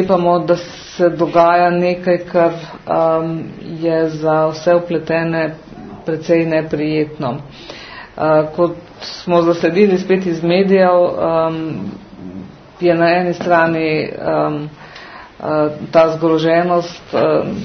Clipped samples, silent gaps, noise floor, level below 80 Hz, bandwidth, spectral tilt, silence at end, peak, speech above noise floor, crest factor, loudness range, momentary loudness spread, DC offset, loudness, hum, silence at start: under 0.1%; none; -35 dBFS; -50 dBFS; 6.6 kHz; -7 dB/octave; 0 s; 0 dBFS; 21 dB; 16 dB; 4 LU; 17 LU; under 0.1%; -15 LUFS; none; 0 s